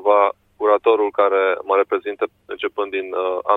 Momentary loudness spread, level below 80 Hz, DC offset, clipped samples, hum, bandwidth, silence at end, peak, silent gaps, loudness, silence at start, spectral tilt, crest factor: 10 LU; -66 dBFS; under 0.1%; under 0.1%; none; 4 kHz; 0 s; -2 dBFS; none; -19 LUFS; 0 s; -5.5 dB/octave; 16 dB